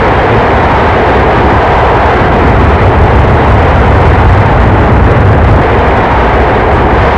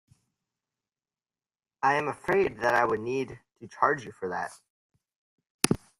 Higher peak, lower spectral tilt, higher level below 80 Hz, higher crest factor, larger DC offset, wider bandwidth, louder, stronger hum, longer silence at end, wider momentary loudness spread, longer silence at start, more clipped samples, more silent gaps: about the same, 0 dBFS vs 0 dBFS; first, -8 dB/octave vs -4 dB/octave; first, -12 dBFS vs -62 dBFS; second, 6 dB vs 30 dB; first, 1% vs under 0.1%; second, 8 kHz vs 15.5 kHz; first, -6 LUFS vs -28 LUFS; neither; second, 0 s vs 0.25 s; second, 1 LU vs 13 LU; second, 0 s vs 1.8 s; first, 6% vs under 0.1%; second, none vs 4.70-4.90 s, 5.16-5.38 s, 5.50-5.59 s